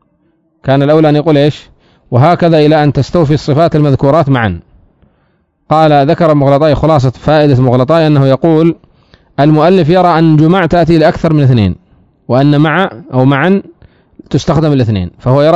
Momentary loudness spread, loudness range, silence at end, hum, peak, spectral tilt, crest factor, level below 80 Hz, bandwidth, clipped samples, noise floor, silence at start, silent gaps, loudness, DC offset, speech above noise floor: 7 LU; 3 LU; 0 s; none; 0 dBFS; -8.5 dB/octave; 8 dB; -34 dBFS; 7.8 kHz; 3%; -56 dBFS; 0.65 s; none; -9 LUFS; 0.4%; 48 dB